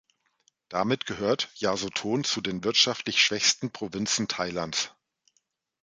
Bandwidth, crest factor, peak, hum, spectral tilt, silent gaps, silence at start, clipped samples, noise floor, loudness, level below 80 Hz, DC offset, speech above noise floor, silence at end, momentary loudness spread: 11 kHz; 20 dB; -8 dBFS; none; -2.5 dB/octave; none; 0.7 s; under 0.1%; -74 dBFS; -26 LUFS; -64 dBFS; under 0.1%; 47 dB; 0.95 s; 8 LU